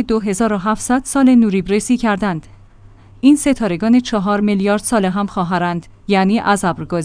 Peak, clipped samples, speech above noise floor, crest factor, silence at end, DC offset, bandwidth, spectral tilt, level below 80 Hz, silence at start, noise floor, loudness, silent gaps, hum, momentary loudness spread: -2 dBFS; under 0.1%; 27 dB; 14 dB; 0 s; under 0.1%; 10.5 kHz; -5.5 dB/octave; -40 dBFS; 0 s; -42 dBFS; -16 LUFS; none; none; 7 LU